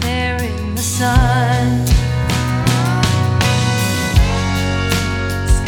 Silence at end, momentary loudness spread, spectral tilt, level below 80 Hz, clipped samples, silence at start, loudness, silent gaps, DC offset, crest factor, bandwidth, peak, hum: 0 s; 5 LU; -5 dB/octave; -22 dBFS; under 0.1%; 0 s; -16 LUFS; none; under 0.1%; 14 dB; 18 kHz; 0 dBFS; none